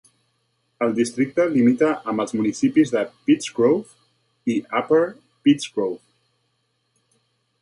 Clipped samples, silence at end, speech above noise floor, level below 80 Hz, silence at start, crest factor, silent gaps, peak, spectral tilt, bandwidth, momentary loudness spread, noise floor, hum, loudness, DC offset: under 0.1%; 1.65 s; 51 dB; -68 dBFS; 0.8 s; 16 dB; none; -6 dBFS; -5.5 dB/octave; 11.5 kHz; 8 LU; -70 dBFS; none; -21 LUFS; under 0.1%